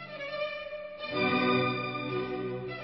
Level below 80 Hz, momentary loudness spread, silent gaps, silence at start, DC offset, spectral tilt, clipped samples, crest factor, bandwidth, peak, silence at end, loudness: -64 dBFS; 12 LU; none; 0 s; under 0.1%; -8.5 dB/octave; under 0.1%; 18 dB; 6 kHz; -14 dBFS; 0 s; -31 LUFS